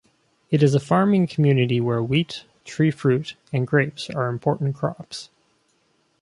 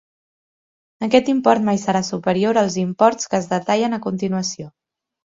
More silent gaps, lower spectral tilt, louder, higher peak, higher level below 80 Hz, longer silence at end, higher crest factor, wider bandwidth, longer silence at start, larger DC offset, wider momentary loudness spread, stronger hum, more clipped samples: neither; first, -7 dB/octave vs -5 dB/octave; second, -22 LUFS vs -19 LUFS; second, -4 dBFS vs 0 dBFS; about the same, -60 dBFS vs -60 dBFS; first, 0.95 s vs 0.7 s; about the same, 18 dB vs 20 dB; first, 11.5 kHz vs 7.8 kHz; second, 0.5 s vs 1 s; neither; first, 13 LU vs 8 LU; neither; neither